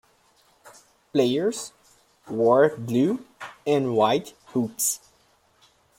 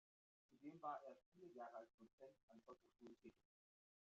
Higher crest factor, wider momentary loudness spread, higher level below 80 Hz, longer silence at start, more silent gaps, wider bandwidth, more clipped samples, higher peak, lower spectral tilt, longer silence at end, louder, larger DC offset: second, 18 dB vs 24 dB; about the same, 14 LU vs 15 LU; first, -68 dBFS vs under -90 dBFS; first, 0.65 s vs 0.5 s; second, none vs 1.26-1.32 s, 1.94-1.98 s, 2.13-2.18 s, 2.43-2.48 s; first, 16.5 kHz vs 7.2 kHz; neither; first, -6 dBFS vs -38 dBFS; about the same, -4.5 dB/octave vs -5 dB/octave; first, 1 s vs 0.85 s; first, -24 LUFS vs -60 LUFS; neither